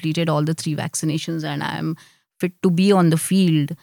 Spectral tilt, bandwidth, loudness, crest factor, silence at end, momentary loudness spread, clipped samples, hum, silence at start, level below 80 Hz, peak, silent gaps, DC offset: -6 dB/octave; 19 kHz; -20 LUFS; 14 dB; 0.05 s; 11 LU; under 0.1%; none; 0 s; -72 dBFS; -6 dBFS; none; under 0.1%